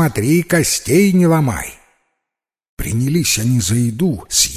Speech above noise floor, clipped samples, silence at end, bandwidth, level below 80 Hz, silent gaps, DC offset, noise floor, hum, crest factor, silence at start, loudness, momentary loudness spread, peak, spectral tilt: 68 dB; under 0.1%; 0 s; 16 kHz; -38 dBFS; 2.69-2.77 s; under 0.1%; -83 dBFS; none; 16 dB; 0 s; -15 LUFS; 9 LU; 0 dBFS; -4.5 dB/octave